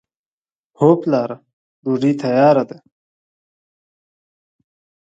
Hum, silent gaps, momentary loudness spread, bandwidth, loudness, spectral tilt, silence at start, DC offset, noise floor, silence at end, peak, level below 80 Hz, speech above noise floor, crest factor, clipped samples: none; 1.53-1.83 s; 16 LU; 7.8 kHz; -16 LUFS; -8.5 dB/octave; 0.8 s; under 0.1%; under -90 dBFS; 2.35 s; 0 dBFS; -68 dBFS; over 75 dB; 20 dB; under 0.1%